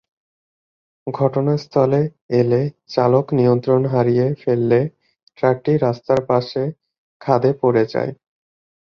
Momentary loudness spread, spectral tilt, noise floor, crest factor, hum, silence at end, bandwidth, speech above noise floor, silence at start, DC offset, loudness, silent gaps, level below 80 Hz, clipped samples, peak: 8 LU; -9 dB/octave; under -90 dBFS; 18 dB; none; 0.85 s; 6.8 kHz; over 73 dB; 1.05 s; under 0.1%; -18 LUFS; 2.21-2.29 s, 5.23-5.27 s, 6.98-7.20 s; -56 dBFS; under 0.1%; -2 dBFS